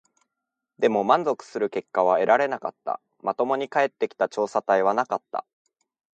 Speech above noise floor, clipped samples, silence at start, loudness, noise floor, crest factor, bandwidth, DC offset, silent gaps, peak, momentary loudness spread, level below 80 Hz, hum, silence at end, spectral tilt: 61 dB; under 0.1%; 0.8 s; -24 LUFS; -84 dBFS; 20 dB; 8.8 kHz; under 0.1%; none; -4 dBFS; 11 LU; -76 dBFS; none; 0.75 s; -5 dB/octave